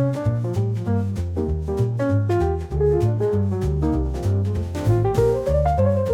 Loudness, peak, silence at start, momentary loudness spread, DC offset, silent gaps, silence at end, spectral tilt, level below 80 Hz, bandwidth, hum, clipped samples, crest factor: -22 LUFS; -6 dBFS; 0 s; 5 LU; under 0.1%; none; 0 s; -9 dB/octave; -32 dBFS; 12 kHz; none; under 0.1%; 14 dB